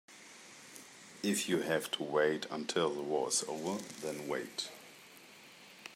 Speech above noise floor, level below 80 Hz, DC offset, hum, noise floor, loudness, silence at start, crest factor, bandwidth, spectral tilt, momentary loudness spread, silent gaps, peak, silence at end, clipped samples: 21 dB; -84 dBFS; under 0.1%; none; -56 dBFS; -35 LUFS; 0.1 s; 20 dB; 16 kHz; -3 dB/octave; 21 LU; none; -18 dBFS; 0 s; under 0.1%